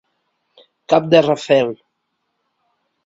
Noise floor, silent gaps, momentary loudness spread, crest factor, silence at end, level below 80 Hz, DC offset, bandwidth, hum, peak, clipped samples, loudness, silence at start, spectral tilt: -72 dBFS; none; 11 LU; 20 dB; 1.3 s; -62 dBFS; under 0.1%; 7.8 kHz; none; 0 dBFS; under 0.1%; -15 LUFS; 0.9 s; -6 dB/octave